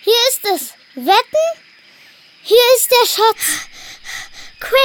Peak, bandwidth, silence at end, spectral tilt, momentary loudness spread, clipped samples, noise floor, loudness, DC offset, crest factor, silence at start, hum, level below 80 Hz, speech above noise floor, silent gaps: -2 dBFS; 19 kHz; 0 s; 0.5 dB/octave; 22 LU; under 0.1%; -45 dBFS; -13 LUFS; under 0.1%; 14 dB; 0.05 s; none; -52 dBFS; 31 dB; none